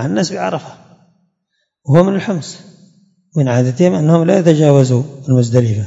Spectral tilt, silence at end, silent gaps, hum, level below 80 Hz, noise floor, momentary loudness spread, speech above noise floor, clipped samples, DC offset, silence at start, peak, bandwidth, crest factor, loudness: -7.5 dB/octave; 0 s; none; none; -56 dBFS; -69 dBFS; 13 LU; 57 dB; 0.3%; under 0.1%; 0 s; 0 dBFS; 7.8 kHz; 14 dB; -13 LUFS